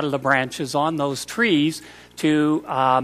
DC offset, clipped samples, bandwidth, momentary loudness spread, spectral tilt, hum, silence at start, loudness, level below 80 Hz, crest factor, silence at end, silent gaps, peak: under 0.1%; under 0.1%; 14.5 kHz; 6 LU; -5 dB/octave; 60 Hz at -50 dBFS; 0 s; -21 LUFS; -60 dBFS; 16 dB; 0 s; none; -4 dBFS